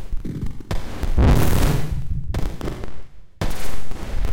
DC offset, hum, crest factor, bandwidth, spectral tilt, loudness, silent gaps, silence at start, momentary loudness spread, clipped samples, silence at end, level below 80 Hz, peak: under 0.1%; none; 12 dB; 17 kHz; -6 dB/octave; -24 LUFS; none; 0 s; 15 LU; under 0.1%; 0 s; -24 dBFS; -6 dBFS